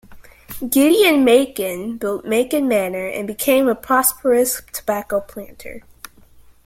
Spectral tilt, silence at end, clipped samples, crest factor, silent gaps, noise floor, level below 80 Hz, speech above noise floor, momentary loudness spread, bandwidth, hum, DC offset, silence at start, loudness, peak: -3 dB/octave; 0.85 s; under 0.1%; 18 dB; none; -47 dBFS; -52 dBFS; 29 dB; 22 LU; 16.5 kHz; none; under 0.1%; 0.1 s; -17 LUFS; 0 dBFS